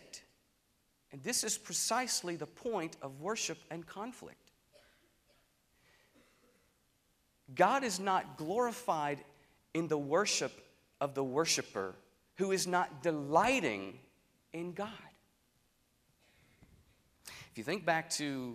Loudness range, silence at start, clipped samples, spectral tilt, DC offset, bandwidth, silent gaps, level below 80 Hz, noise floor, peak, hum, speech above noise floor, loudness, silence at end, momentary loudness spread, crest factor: 15 LU; 0.15 s; under 0.1%; -3 dB/octave; under 0.1%; 15.5 kHz; none; -74 dBFS; -75 dBFS; -14 dBFS; none; 40 dB; -35 LUFS; 0 s; 16 LU; 24 dB